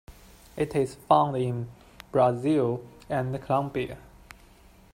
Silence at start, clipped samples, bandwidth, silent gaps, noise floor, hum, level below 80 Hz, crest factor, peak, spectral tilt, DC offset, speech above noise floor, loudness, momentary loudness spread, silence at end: 0.1 s; under 0.1%; 16 kHz; none; -54 dBFS; none; -54 dBFS; 22 dB; -6 dBFS; -7.5 dB/octave; under 0.1%; 29 dB; -27 LUFS; 14 LU; 0.95 s